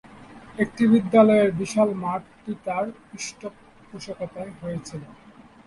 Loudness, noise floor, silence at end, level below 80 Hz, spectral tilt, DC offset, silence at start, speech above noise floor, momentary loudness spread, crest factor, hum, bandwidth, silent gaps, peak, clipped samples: -23 LUFS; -45 dBFS; 0.55 s; -60 dBFS; -6 dB/octave; under 0.1%; 0.15 s; 22 dB; 23 LU; 20 dB; none; 11.5 kHz; none; -4 dBFS; under 0.1%